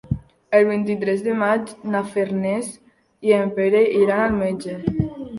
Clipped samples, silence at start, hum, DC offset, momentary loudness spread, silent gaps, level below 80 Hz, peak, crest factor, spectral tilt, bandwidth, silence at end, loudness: under 0.1%; 0.05 s; none; under 0.1%; 9 LU; none; -46 dBFS; -2 dBFS; 18 dB; -7 dB/octave; 11.5 kHz; 0 s; -20 LUFS